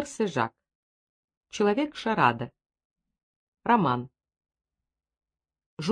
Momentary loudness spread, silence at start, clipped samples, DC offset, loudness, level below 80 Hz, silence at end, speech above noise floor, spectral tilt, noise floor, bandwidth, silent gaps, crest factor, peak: 14 LU; 0 s; under 0.1%; under 0.1%; -27 LUFS; -66 dBFS; 0 s; 63 dB; -5.5 dB/octave; -88 dBFS; 10.5 kHz; 0.75-1.28 s, 1.37-1.41 s, 2.85-2.96 s, 3.23-3.52 s, 5.66-5.77 s; 22 dB; -8 dBFS